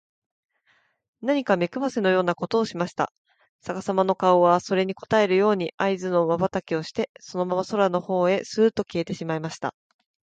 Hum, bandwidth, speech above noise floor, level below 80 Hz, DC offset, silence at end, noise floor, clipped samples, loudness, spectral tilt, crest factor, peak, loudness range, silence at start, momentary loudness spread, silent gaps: none; 9 kHz; 43 dB; -64 dBFS; under 0.1%; 0.55 s; -66 dBFS; under 0.1%; -24 LUFS; -6 dB/octave; 18 dB; -6 dBFS; 4 LU; 1.2 s; 11 LU; 3.18-3.25 s, 3.49-3.59 s, 5.74-5.78 s, 7.09-7.15 s